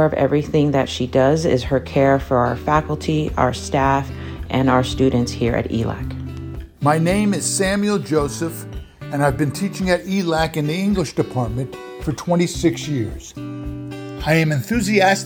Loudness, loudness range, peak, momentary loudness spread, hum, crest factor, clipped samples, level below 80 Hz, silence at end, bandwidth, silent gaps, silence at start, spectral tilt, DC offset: -19 LUFS; 4 LU; -2 dBFS; 13 LU; none; 16 dB; under 0.1%; -38 dBFS; 0 s; over 20 kHz; none; 0 s; -5.5 dB/octave; under 0.1%